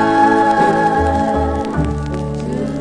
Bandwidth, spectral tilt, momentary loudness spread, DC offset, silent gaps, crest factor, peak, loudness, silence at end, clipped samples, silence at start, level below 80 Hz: 10.5 kHz; -7 dB/octave; 10 LU; 0.3%; none; 14 dB; -2 dBFS; -16 LUFS; 0 s; under 0.1%; 0 s; -28 dBFS